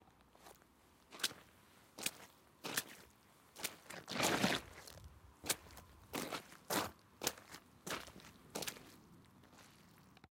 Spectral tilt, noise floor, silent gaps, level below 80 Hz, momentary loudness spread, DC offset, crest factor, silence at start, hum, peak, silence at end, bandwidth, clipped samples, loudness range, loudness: -2 dB/octave; -68 dBFS; none; -70 dBFS; 24 LU; under 0.1%; 32 dB; 0.4 s; none; -16 dBFS; 0.05 s; 17 kHz; under 0.1%; 5 LU; -42 LUFS